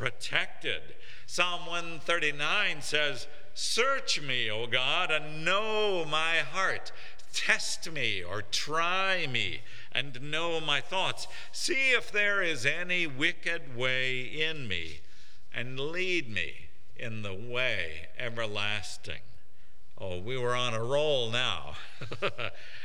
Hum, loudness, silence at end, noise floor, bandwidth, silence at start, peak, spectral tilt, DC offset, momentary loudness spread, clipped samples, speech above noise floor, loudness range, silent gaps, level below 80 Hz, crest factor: none; -30 LUFS; 0 s; -61 dBFS; 17 kHz; 0 s; -8 dBFS; -2.5 dB/octave; 3%; 13 LU; under 0.1%; 30 dB; 6 LU; none; -64 dBFS; 22 dB